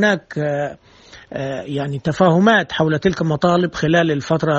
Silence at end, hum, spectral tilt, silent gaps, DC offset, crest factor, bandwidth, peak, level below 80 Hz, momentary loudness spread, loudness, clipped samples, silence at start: 0 s; none; -6.5 dB/octave; none; under 0.1%; 18 dB; 8 kHz; 0 dBFS; -48 dBFS; 12 LU; -18 LUFS; under 0.1%; 0 s